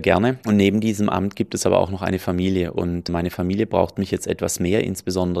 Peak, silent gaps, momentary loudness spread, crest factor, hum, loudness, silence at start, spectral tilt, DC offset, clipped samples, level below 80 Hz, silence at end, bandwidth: -2 dBFS; none; 6 LU; 20 dB; none; -21 LUFS; 0 s; -5.5 dB/octave; under 0.1%; under 0.1%; -50 dBFS; 0 s; 15 kHz